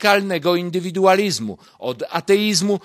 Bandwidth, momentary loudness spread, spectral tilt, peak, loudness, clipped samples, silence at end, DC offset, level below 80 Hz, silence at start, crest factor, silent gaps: 15.5 kHz; 13 LU; -4 dB/octave; 0 dBFS; -19 LUFS; under 0.1%; 0.05 s; under 0.1%; -64 dBFS; 0 s; 18 dB; none